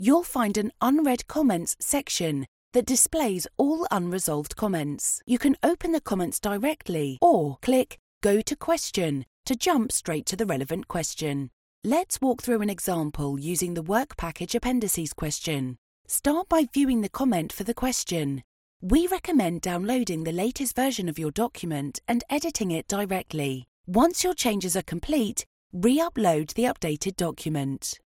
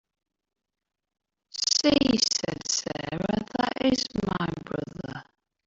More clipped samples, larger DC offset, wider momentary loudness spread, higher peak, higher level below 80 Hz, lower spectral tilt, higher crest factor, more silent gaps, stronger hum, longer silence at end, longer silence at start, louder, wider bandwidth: neither; neither; second, 8 LU vs 16 LU; about the same, -8 dBFS vs -8 dBFS; first, -48 dBFS vs -54 dBFS; about the same, -4.5 dB/octave vs -3.5 dB/octave; about the same, 18 dB vs 20 dB; first, 2.48-2.71 s, 7.99-8.21 s, 9.27-9.44 s, 11.53-11.82 s, 15.78-16.05 s, 18.44-18.80 s, 23.68-23.84 s, 25.46-25.70 s vs none; neither; second, 0.2 s vs 0.45 s; second, 0 s vs 1.55 s; about the same, -26 LUFS vs -26 LUFS; first, 17 kHz vs 8.2 kHz